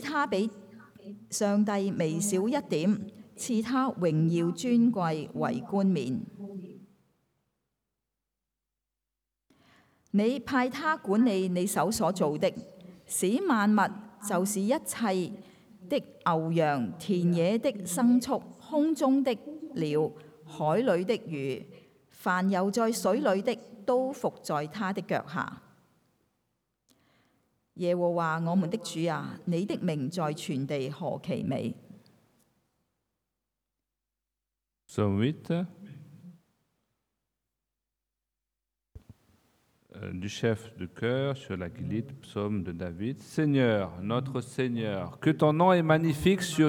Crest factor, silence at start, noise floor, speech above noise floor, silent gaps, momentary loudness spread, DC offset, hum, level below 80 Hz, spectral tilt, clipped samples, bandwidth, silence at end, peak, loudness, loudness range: 20 dB; 0 s; -88 dBFS; 60 dB; none; 11 LU; under 0.1%; none; -66 dBFS; -6 dB/octave; under 0.1%; 17 kHz; 0 s; -10 dBFS; -29 LUFS; 9 LU